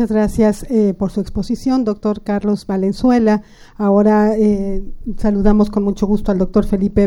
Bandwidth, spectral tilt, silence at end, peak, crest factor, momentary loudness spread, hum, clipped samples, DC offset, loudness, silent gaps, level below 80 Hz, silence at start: 12 kHz; -8 dB/octave; 0 s; -2 dBFS; 12 dB; 8 LU; none; under 0.1%; under 0.1%; -16 LUFS; none; -28 dBFS; 0 s